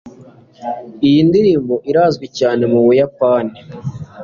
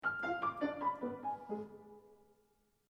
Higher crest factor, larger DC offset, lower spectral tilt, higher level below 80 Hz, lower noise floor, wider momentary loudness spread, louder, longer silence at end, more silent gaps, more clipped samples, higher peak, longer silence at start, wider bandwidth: about the same, 12 dB vs 16 dB; neither; about the same, -7.5 dB/octave vs -6.5 dB/octave; first, -50 dBFS vs -76 dBFS; second, -41 dBFS vs -75 dBFS; about the same, 16 LU vs 16 LU; first, -13 LUFS vs -40 LUFS; second, 0 s vs 0.75 s; neither; neither; first, -2 dBFS vs -24 dBFS; about the same, 0.05 s vs 0 s; second, 7.2 kHz vs 12 kHz